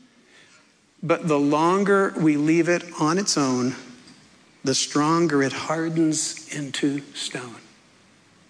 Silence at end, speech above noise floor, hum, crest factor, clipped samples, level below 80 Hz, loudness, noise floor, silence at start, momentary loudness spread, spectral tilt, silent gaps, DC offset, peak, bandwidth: 0.9 s; 35 dB; none; 14 dB; under 0.1%; -72 dBFS; -22 LUFS; -57 dBFS; 1.05 s; 11 LU; -4.5 dB/octave; none; under 0.1%; -8 dBFS; 11 kHz